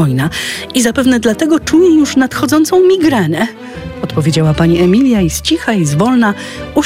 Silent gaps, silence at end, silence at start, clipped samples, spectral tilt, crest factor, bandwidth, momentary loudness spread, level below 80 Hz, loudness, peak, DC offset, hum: none; 0 s; 0 s; under 0.1%; -5.5 dB/octave; 10 dB; 16 kHz; 9 LU; -36 dBFS; -11 LUFS; 0 dBFS; under 0.1%; none